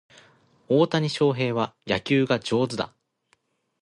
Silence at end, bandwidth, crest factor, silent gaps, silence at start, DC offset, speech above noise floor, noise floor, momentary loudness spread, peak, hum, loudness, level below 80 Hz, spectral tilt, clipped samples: 0.95 s; 11.5 kHz; 18 dB; none; 0.7 s; under 0.1%; 45 dB; -69 dBFS; 7 LU; -6 dBFS; none; -24 LUFS; -62 dBFS; -6 dB/octave; under 0.1%